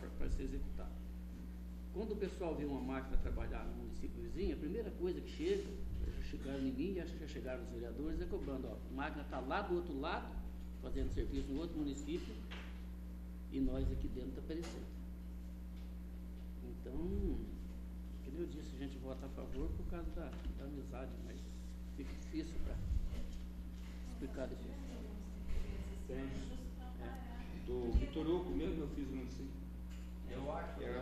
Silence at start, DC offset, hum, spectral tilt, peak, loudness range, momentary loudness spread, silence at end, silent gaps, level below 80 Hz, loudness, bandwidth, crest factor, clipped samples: 0 s; under 0.1%; none; -7 dB/octave; -22 dBFS; 5 LU; 10 LU; 0 s; none; -46 dBFS; -45 LUFS; 14 kHz; 20 dB; under 0.1%